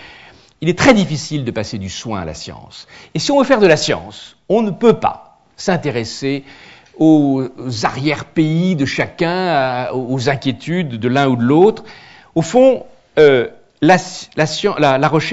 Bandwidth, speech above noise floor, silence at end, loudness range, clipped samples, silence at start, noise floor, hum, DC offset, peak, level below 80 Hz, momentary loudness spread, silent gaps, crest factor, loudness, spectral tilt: 8 kHz; 28 dB; 0 s; 4 LU; under 0.1%; 0 s; -43 dBFS; none; under 0.1%; 0 dBFS; -48 dBFS; 14 LU; none; 16 dB; -15 LUFS; -5.5 dB/octave